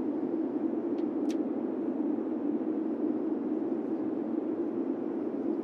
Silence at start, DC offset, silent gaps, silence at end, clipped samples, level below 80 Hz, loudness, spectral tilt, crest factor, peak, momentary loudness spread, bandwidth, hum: 0 s; under 0.1%; none; 0 s; under 0.1%; under -90 dBFS; -32 LUFS; -8 dB/octave; 12 dB; -20 dBFS; 2 LU; 6.6 kHz; none